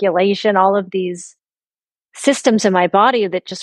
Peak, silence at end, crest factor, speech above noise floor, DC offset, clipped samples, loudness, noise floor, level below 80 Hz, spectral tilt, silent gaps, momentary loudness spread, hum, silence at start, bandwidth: 0 dBFS; 0 s; 16 dB; over 75 dB; under 0.1%; under 0.1%; -15 LUFS; under -90 dBFS; -66 dBFS; -4.5 dB/octave; none; 9 LU; none; 0 s; 12 kHz